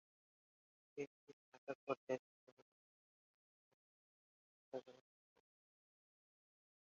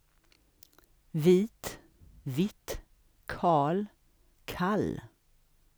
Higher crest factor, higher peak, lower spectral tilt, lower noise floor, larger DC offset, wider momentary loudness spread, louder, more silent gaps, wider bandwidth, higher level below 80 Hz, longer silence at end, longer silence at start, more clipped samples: first, 28 dB vs 20 dB; second, -28 dBFS vs -12 dBFS; second, -4.5 dB/octave vs -6.5 dB/octave; first, under -90 dBFS vs -66 dBFS; neither; second, 15 LU vs 19 LU; second, -51 LUFS vs -30 LUFS; first, 1.07-1.27 s, 1.33-1.52 s, 1.58-1.67 s, 1.75-1.87 s, 1.97-2.07 s, 2.19-4.72 s vs none; second, 7.2 kHz vs over 20 kHz; second, under -90 dBFS vs -56 dBFS; first, 2 s vs 0.7 s; second, 0.95 s vs 1.15 s; neither